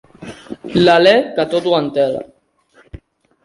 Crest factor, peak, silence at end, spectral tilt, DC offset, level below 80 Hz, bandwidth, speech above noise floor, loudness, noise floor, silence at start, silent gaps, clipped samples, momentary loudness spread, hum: 16 dB; 0 dBFS; 0.5 s; -6 dB/octave; under 0.1%; -48 dBFS; 11.5 kHz; 40 dB; -14 LUFS; -53 dBFS; 0.2 s; none; under 0.1%; 22 LU; none